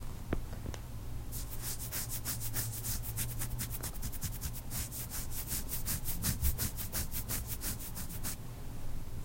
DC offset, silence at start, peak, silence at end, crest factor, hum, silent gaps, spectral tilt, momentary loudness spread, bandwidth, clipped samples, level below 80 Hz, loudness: under 0.1%; 0 s; -18 dBFS; 0 s; 20 dB; none; none; -3.5 dB/octave; 10 LU; 16.5 kHz; under 0.1%; -42 dBFS; -38 LUFS